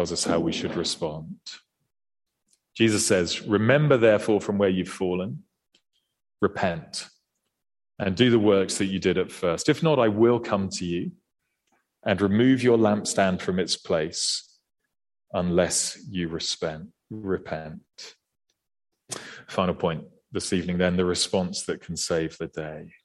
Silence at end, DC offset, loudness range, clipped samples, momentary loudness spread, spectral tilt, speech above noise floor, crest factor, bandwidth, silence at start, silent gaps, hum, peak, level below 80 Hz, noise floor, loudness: 0.15 s; under 0.1%; 9 LU; under 0.1%; 17 LU; -4.5 dB/octave; 50 dB; 20 dB; 12.5 kHz; 0 s; none; none; -6 dBFS; -58 dBFS; -74 dBFS; -24 LUFS